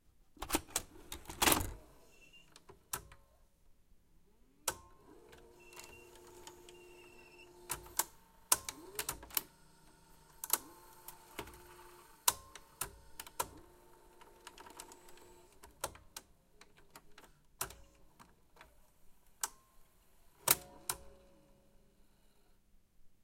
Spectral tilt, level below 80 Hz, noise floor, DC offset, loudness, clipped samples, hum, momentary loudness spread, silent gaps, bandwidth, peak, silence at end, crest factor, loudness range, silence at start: -1 dB/octave; -60 dBFS; -66 dBFS; under 0.1%; -38 LUFS; under 0.1%; none; 26 LU; none; 16.5 kHz; -10 dBFS; 0.1 s; 36 dB; 13 LU; 0.4 s